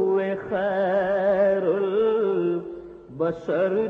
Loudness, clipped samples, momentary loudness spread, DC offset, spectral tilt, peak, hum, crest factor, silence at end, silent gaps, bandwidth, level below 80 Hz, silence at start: -23 LUFS; under 0.1%; 9 LU; under 0.1%; -8.5 dB/octave; -10 dBFS; none; 12 dB; 0 s; none; 6 kHz; -60 dBFS; 0 s